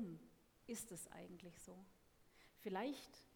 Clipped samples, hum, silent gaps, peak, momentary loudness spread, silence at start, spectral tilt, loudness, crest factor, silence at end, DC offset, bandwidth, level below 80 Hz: under 0.1%; none; none; -32 dBFS; 20 LU; 0 s; -4 dB/octave; -52 LUFS; 22 dB; 0 s; under 0.1%; 19 kHz; -78 dBFS